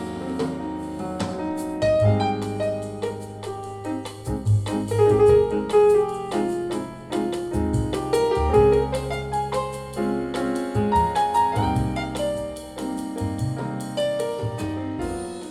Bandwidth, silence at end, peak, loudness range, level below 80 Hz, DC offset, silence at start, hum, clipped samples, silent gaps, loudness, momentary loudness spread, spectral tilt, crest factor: 14 kHz; 0 s; -6 dBFS; 5 LU; -38 dBFS; under 0.1%; 0 s; none; under 0.1%; none; -24 LUFS; 13 LU; -6.5 dB/octave; 18 dB